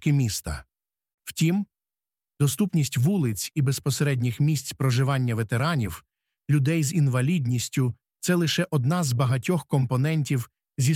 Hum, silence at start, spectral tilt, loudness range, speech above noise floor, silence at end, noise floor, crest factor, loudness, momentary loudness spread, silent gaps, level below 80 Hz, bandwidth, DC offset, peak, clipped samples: none; 0 s; -5.5 dB/octave; 2 LU; over 66 dB; 0 s; under -90 dBFS; 14 dB; -25 LUFS; 8 LU; 1.14-1.18 s; -52 dBFS; 16 kHz; under 0.1%; -10 dBFS; under 0.1%